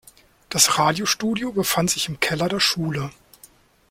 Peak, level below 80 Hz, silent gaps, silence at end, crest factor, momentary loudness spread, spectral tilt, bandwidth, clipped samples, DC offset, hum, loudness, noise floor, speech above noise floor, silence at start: -2 dBFS; -54 dBFS; none; 0.8 s; 20 dB; 11 LU; -2.5 dB/octave; 16.5 kHz; under 0.1%; under 0.1%; none; -20 LUFS; -52 dBFS; 31 dB; 0.5 s